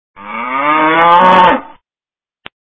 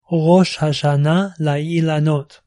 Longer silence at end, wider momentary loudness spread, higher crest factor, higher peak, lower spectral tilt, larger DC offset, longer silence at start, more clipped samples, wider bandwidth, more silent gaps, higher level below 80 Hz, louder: first, 0.95 s vs 0.25 s; first, 14 LU vs 6 LU; about the same, 12 dB vs 14 dB; about the same, 0 dBFS vs -2 dBFS; about the same, -6 dB/octave vs -7 dB/octave; neither; about the same, 0.2 s vs 0.1 s; first, 0.3% vs under 0.1%; second, 8 kHz vs 11 kHz; neither; first, -48 dBFS vs -56 dBFS; first, -9 LUFS vs -17 LUFS